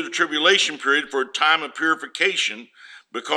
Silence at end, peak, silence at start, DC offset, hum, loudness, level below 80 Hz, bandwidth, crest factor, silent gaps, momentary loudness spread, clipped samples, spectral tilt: 0 s; -2 dBFS; 0 s; under 0.1%; none; -19 LUFS; -80 dBFS; 12 kHz; 20 dB; none; 11 LU; under 0.1%; -0.5 dB/octave